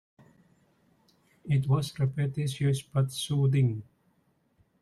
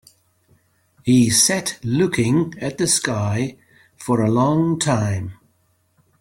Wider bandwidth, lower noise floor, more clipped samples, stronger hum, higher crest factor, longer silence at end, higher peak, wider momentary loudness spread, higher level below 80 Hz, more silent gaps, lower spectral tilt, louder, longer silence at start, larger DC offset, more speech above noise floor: second, 12.5 kHz vs 16.5 kHz; first, -70 dBFS vs -63 dBFS; neither; neither; about the same, 16 dB vs 18 dB; about the same, 1 s vs 0.9 s; second, -14 dBFS vs -2 dBFS; second, 5 LU vs 12 LU; second, -62 dBFS vs -54 dBFS; neither; first, -6.5 dB/octave vs -4.5 dB/octave; second, -29 LUFS vs -19 LUFS; first, 1.45 s vs 1.05 s; neither; about the same, 43 dB vs 45 dB